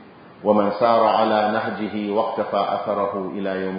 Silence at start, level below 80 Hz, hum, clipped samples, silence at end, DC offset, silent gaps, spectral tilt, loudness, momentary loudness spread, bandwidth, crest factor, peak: 0 s; -62 dBFS; none; under 0.1%; 0 s; under 0.1%; none; -10.5 dB/octave; -21 LUFS; 9 LU; 5.2 kHz; 18 dB; -4 dBFS